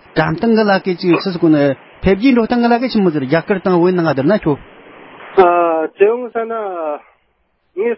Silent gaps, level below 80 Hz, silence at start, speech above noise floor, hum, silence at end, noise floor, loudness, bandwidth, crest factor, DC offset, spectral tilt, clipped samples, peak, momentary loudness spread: none; -42 dBFS; 0.15 s; 48 dB; none; 0 s; -62 dBFS; -14 LUFS; 5.8 kHz; 14 dB; under 0.1%; -10.5 dB/octave; under 0.1%; 0 dBFS; 9 LU